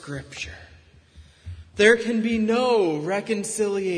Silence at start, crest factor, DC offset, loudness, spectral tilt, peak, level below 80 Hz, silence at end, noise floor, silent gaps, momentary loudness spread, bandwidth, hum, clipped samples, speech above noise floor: 0 s; 20 dB; under 0.1%; -22 LUFS; -4 dB/octave; -4 dBFS; -52 dBFS; 0 s; -50 dBFS; none; 18 LU; 11 kHz; none; under 0.1%; 28 dB